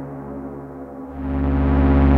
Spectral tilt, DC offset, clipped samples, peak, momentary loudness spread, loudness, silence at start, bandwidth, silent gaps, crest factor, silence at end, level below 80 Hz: -11 dB/octave; under 0.1%; under 0.1%; -6 dBFS; 18 LU; -21 LUFS; 0 s; 4.1 kHz; none; 14 dB; 0 s; -24 dBFS